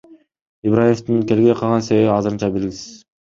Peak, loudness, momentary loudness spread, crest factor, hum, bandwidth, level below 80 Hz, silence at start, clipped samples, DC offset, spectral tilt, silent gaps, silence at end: -2 dBFS; -17 LUFS; 11 LU; 16 dB; none; 7.6 kHz; -50 dBFS; 0.1 s; under 0.1%; under 0.1%; -7 dB/octave; 0.42-0.62 s; 0.3 s